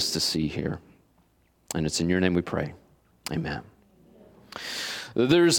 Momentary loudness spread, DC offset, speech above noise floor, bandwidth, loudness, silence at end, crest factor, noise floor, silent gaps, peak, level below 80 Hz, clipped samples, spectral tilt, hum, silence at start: 14 LU; under 0.1%; 39 dB; 18 kHz; -28 LUFS; 0 s; 20 dB; -64 dBFS; none; -6 dBFS; -54 dBFS; under 0.1%; -4 dB/octave; none; 0 s